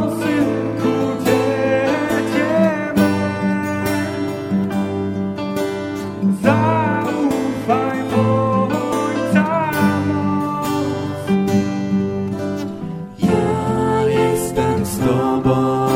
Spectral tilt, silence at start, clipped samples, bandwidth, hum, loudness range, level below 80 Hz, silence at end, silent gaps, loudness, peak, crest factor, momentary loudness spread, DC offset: -6.5 dB/octave; 0 s; under 0.1%; 16.5 kHz; none; 3 LU; -46 dBFS; 0 s; none; -18 LUFS; 0 dBFS; 16 dB; 6 LU; under 0.1%